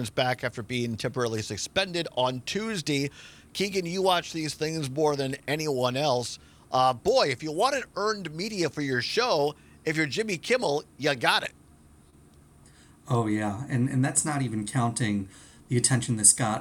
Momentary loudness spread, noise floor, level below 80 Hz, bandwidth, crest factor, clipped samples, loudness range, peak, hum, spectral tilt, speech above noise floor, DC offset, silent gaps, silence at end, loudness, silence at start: 7 LU; -55 dBFS; -60 dBFS; 18 kHz; 24 dB; under 0.1%; 3 LU; -2 dBFS; none; -3.5 dB/octave; 28 dB; under 0.1%; none; 0 s; -27 LUFS; 0 s